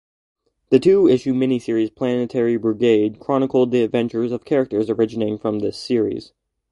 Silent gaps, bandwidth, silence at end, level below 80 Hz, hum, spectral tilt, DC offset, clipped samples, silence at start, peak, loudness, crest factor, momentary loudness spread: none; 11 kHz; 0.45 s; -58 dBFS; none; -7.5 dB/octave; under 0.1%; under 0.1%; 0.7 s; 0 dBFS; -19 LUFS; 18 dB; 8 LU